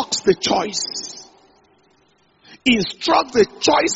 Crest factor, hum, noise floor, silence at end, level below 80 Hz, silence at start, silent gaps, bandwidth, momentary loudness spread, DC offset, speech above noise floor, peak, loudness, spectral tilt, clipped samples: 18 dB; none; -58 dBFS; 0 s; -52 dBFS; 0 s; none; 8 kHz; 11 LU; under 0.1%; 40 dB; -2 dBFS; -18 LUFS; -2 dB/octave; under 0.1%